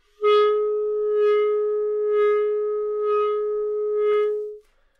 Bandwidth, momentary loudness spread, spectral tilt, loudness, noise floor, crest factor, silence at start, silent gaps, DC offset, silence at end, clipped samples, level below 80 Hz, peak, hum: 4.9 kHz; 6 LU; -3.5 dB/octave; -22 LUFS; -43 dBFS; 12 dB; 0.2 s; none; under 0.1%; 0.4 s; under 0.1%; -64 dBFS; -10 dBFS; none